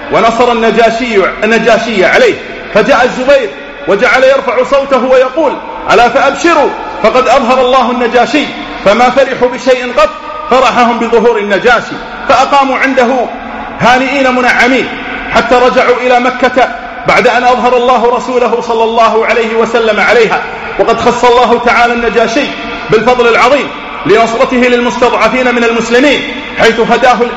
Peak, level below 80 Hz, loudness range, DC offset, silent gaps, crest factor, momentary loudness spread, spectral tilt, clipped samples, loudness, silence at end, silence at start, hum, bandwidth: 0 dBFS; -36 dBFS; 1 LU; under 0.1%; none; 8 dB; 6 LU; -4 dB/octave; 1%; -8 LUFS; 0 s; 0 s; none; 9.6 kHz